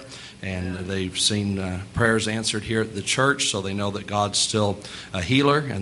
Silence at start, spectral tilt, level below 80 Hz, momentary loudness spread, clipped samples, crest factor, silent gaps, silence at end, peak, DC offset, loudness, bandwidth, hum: 0 s; -3.5 dB/octave; -52 dBFS; 10 LU; under 0.1%; 20 dB; none; 0 s; -4 dBFS; under 0.1%; -23 LUFS; 11.5 kHz; none